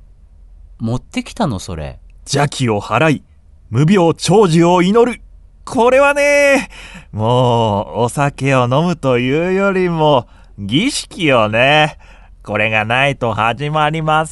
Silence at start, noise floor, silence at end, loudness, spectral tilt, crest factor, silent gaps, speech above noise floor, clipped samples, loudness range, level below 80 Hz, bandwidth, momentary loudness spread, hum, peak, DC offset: 0.8 s; -41 dBFS; 0 s; -14 LUFS; -5.5 dB/octave; 14 dB; none; 28 dB; under 0.1%; 4 LU; -40 dBFS; 11.5 kHz; 12 LU; none; 0 dBFS; under 0.1%